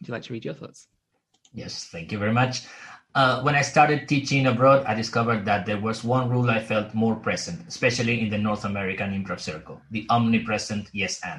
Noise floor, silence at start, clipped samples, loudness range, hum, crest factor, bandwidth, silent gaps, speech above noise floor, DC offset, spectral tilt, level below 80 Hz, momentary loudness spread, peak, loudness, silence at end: -66 dBFS; 0 s; under 0.1%; 5 LU; none; 20 dB; 11 kHz; none; 42 dB; under 0.1%; -5.5 dB/octave; -58 dBFS; 15 LU; -4 dBFS; -24 LUFS; 0 s